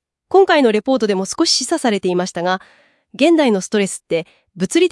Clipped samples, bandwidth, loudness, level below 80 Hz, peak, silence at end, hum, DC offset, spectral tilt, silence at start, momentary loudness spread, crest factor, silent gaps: under 0.1%; 12 kHz; -16 LUFS; -62 dBFS; 0 dBFS; 0.05 s; none; under 0.1%; -4 dB/octave; 0.3 s; 10 LU; 16 dB; none